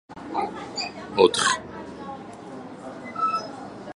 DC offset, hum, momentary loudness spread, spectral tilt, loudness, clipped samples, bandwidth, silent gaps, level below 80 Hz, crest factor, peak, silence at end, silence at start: under 0.1%; none; 19 LU; -2.5 dB/octave; -25 LUFS; under 0.1%; 11.5 kHz; none; -60 dBFS; 26 dB; -2 dBFS; 0.05 s; 0.1 s